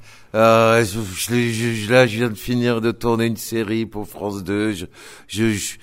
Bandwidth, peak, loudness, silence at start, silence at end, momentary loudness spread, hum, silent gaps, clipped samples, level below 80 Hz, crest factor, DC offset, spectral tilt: 16 kHz; 0 dBFS; -19 LUFS; 0 s; 0.1 s; 13 LU; none; none; under 0.1%; -46 dBFS; 18 dB; under 0.1%; -5 dB/octave